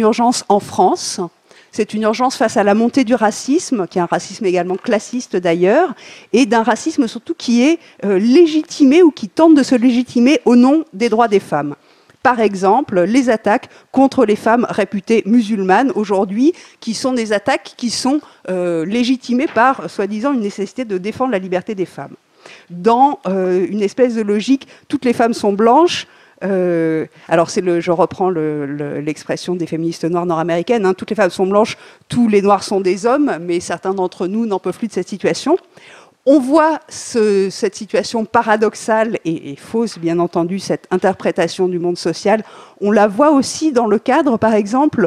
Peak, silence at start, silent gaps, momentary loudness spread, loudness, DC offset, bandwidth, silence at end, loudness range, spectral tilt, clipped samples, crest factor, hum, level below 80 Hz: 0 dBFS; 0 s; none; 10 LU; -15 LUFS; under 0.1%; 13 kHz; 0 s; 5 LU; -5 dB/octave; under 0.1%; 14 dB; none; -60 dBFS